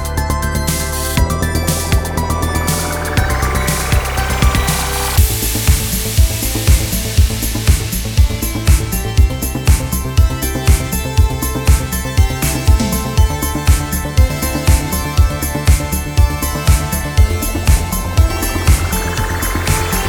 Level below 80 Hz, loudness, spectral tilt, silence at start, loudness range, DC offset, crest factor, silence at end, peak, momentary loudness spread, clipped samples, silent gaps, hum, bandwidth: -16 dBFS; -15 LUFS; -4.5 dB/octave; 0 s; 1 LU; under 0.1%; 14 dB; 0 s; 0 dBFS; 3 LU; under 0.1%; none; none; over 20 kHz